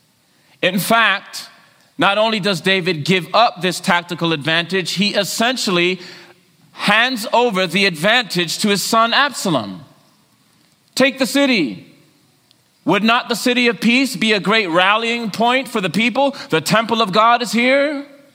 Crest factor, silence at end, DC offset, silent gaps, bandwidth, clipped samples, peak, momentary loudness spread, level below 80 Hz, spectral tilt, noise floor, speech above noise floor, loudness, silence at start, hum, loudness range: 18 dB; 0.3 s; under 0.1%; none; 16.5 kHz; under 0.1%; 0 dBFS; 7 LU; -64 dBFS; -3.5 dB/octave; -56 dBFS; 40 dB; -16 LUFS; 0.6 s; none; 3 LU